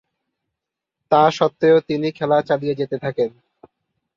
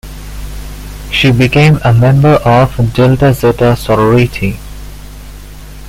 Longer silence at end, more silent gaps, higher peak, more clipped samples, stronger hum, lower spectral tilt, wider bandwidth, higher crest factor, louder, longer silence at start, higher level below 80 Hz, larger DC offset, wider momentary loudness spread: first, 0.9 s vs 0 s; neither; about the same, -2 dBFS vs 0 dBFS; neither; second, none vs 50 Hz at -25 dBFS; about the same, -6.5 dB/octave vs -7 dB/octave; second, 7.4 kHz vs 16 kHz; first, 18 dB vs 10 dB; second, -19 LUFS vs -9 LUFS; first, 1.1 s vs 0.05 s; second, -64 dBFS vs -26 dBFS; neither; second, 9 LU vs 20 LU